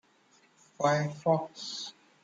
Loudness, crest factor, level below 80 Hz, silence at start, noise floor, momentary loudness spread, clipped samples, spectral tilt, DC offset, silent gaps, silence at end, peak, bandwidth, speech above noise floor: -31 LUFS; 20 dB; -78 dBFS; 0.8 s; -65 dBFS; 11 LU; under 0.1%; -5 dB/octave; under 0.1%; none; 0.35 s; -12 dBFS; 9 kHz; 35 dB